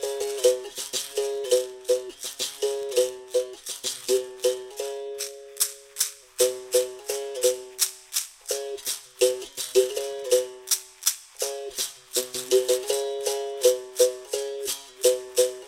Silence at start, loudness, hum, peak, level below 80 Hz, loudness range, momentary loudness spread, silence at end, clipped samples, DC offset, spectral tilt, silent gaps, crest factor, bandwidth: 0 s; -26 LUFS; none; -4 dBFS; -68 dBFS; 3 LU; 8 LU; 0 s; under 0.1%; under 0.1%; 0 dB/octave; none; 22 dB; 17 kHz